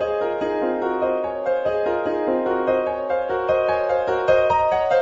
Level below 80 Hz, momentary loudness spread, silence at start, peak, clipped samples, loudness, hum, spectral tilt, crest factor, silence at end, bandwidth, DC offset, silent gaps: -50 dBFS; 5 LU; 0 s; -6 dBFS; under 0.1%; -21 LUFS; none; -6.5 dB/octave; 14 dB; 0 s; 7.4 kHz; under 0.1%; none